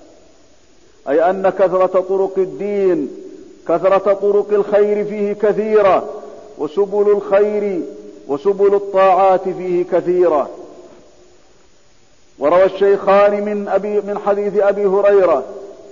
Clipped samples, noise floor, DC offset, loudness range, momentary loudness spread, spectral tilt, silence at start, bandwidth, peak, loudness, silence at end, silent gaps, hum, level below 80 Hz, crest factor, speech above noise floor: under 0.1%; -53 dBFS; 0.4%; 3 LU; 14 LU; -7 dB/octave; 1.05 s; 7.4 kHz; -4 dBFS; -15 LUFS; 0 s; none; none; -56 dBFS; 12 dB; 39 dB